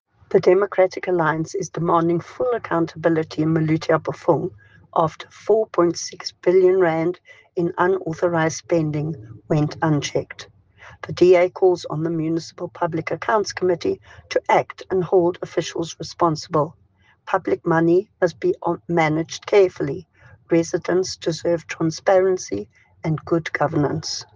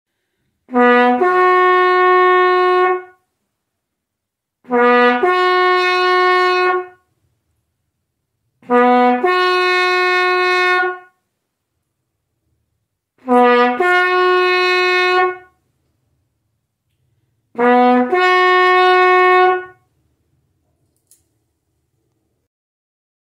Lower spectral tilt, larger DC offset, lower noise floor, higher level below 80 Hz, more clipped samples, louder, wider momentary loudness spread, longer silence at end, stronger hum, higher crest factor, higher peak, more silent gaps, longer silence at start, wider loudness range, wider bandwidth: first, -6 dB/octave vs -3 dB/octave; neither; second, -47 dBFS vs -79 dBFS; first, -60 dBFS vs -68 dBFS; neither; second, -21 LUFS vs -13 LUFS; first, 10 LU vs 7 LU; second, 0.1 s vs 3.6 s; neither; about the same, 18 dB vs 14 dB; about the same, -4 dBFS vs -2 dBFS; neither; second, 0.3 s vs 0.7 s; second, 2 LU vs 6 LU; second, 7.6 kHz vs 11 kHz